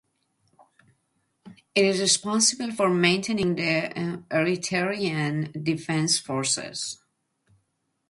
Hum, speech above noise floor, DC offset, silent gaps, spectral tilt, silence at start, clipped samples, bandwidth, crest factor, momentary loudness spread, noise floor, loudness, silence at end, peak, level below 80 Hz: none; 50 dB; under 0.1%; none; -3.5 dB/octave; 1.45 s; under 0.1%; 11.5 kHz; 20 dB; 9 LU; -74 dBFS; -24 LUFS; 1.15 s; -6 dBFS; -64 dBFS